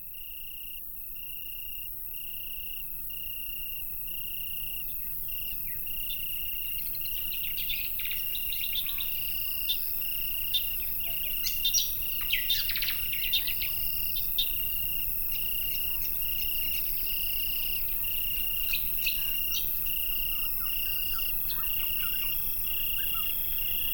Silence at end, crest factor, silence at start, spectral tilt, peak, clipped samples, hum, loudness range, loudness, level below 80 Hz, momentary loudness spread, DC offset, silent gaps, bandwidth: 0 s; 18 dB; 0 s; 0 dB/octave; -12 dBFS; under 0.1%; none; 6 LU; -28 LUFS; -46 dBFS; 8 LU; under 0.1%; none; 18 kHz